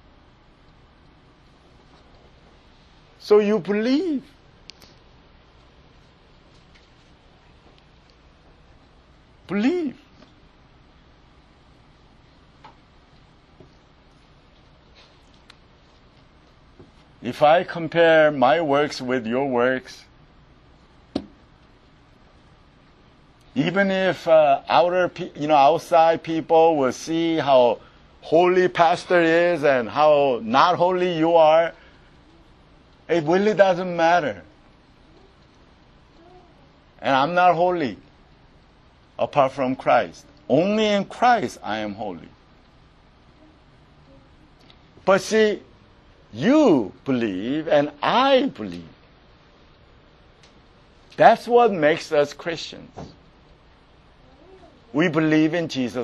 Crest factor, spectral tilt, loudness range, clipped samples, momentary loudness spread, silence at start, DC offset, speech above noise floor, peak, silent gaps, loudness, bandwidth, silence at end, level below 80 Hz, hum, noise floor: 22 dB; -5.5 dB/octave; 12 LU; under 0.1%; 15 LU; 3.25 s; under 0.1%; 34 dB; 0 dBFS; none; -20 LUFS; 12 kHz; 0 s; -56 dBFS; none; -53 dBFS